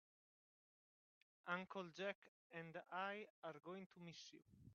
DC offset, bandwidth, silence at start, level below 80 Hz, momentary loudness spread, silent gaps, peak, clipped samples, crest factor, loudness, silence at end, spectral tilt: under 0.1%; 7 kHz; 1.45 s; under -90 dBFS; 11 LU; 2.15-2.22 s, 2.28-2.50 s, 3.30-3.42 s, 3.86-3.90 s; -30 dBFS; under 0.1%; 24 dB; -53 LUFS; 0 s; -3 dB/octave